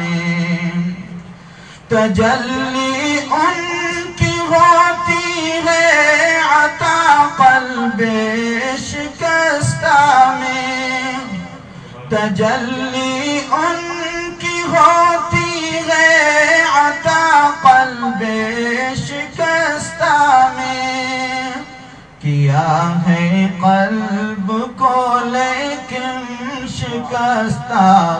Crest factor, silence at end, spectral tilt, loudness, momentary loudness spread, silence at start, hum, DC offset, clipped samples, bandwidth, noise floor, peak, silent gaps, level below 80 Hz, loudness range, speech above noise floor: 14 dB; 0 s; -4.5 dB/octave; -14 LUFS; 12 LU; 0 s; none; under 0.1%; under 0.1%; 10 kHz; -37 dBFS; 0 dBFS; none; -46 dBFS; 6 LU; 23 dB